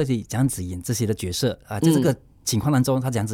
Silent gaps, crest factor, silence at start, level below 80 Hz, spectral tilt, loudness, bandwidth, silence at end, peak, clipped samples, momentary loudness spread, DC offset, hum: none; 16 dB; 0 s; -48 dBFS; -5.5 dB/octave; -23 LUFS; 17.5 kHz; 0 s; -6 dBFS; under 0.1%; 6 LU; under 0.1%; none